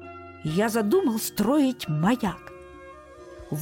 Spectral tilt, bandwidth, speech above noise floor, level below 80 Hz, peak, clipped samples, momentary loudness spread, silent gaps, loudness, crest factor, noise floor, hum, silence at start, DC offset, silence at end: -5.5 dB/octave; 17 kHz; 22 dB; -54 dBFS; -12 dBFS; under 0.1%; 23 LU; none; -25 LUFS; 14 dB; -45 dBFS; none; 0 s; under 0.1%; 0 s